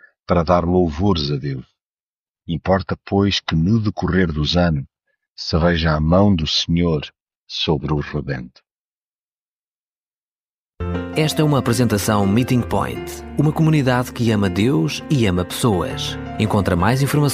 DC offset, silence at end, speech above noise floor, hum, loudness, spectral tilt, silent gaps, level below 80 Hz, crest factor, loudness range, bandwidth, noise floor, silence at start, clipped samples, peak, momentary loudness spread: under 0.1%; 0 s; over 72 dB; none; -19 LUFS; -6 dB/octave; 1.86-2.35 s, 5.30-5.35 s, 7.22-7.27 s, 7.36-7.47 s, 8.71-10.44 s, 10.50-10.73 s; -36 dBFS; 16 dB; 8 LU; 15.5 kHz; under -90 dBFS; 0.3 s; under 0.1%; -2 dBFS; 10 LU